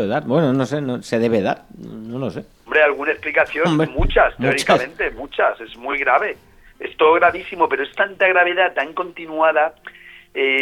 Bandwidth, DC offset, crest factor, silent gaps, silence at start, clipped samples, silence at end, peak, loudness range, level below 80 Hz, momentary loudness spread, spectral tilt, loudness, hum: 14.5 kHz; under 0.1%; 18 dB; none; 0 s; under 0.1%; 0 s; -2 dBFS; 2 LU; -36 dBFS; 14 LU; -5.5 dB/octave; -18 LUFS; none